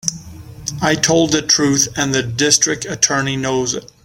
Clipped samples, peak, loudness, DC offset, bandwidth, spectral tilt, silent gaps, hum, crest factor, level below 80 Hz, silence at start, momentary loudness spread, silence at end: under 0.1%; 0 dBFS; -15 LUFS; under 0.1%; 17 kHz; -2.5 dB/octave; none; none; 18 dB; -46 dBFS; 0.05 s; 10 LU; 0.2 s